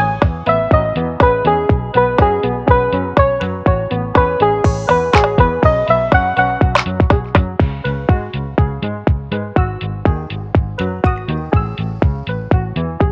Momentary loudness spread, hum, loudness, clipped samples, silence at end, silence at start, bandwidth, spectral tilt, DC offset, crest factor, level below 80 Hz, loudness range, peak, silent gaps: 6 LU; none; -16 LUFS; under 0.1%; 0 s; 0 s; 8.2 kHz; -8 dB/octave; under 0.1%; 14 dB; -24 dBFS; 5 LU; 0 dBFS; none